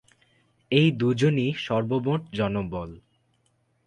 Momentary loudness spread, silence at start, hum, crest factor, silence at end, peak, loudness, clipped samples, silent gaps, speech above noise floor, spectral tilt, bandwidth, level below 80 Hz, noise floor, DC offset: 11 LU; 0.7 s; none; 18 dB; 0.85 s; -8 dBFS; -25 LUFS; under 0.1%; none; 45 dB; -7 dB/octave; 9.6 kHz; -54 dBFS; -69 dBFS; under 0.1%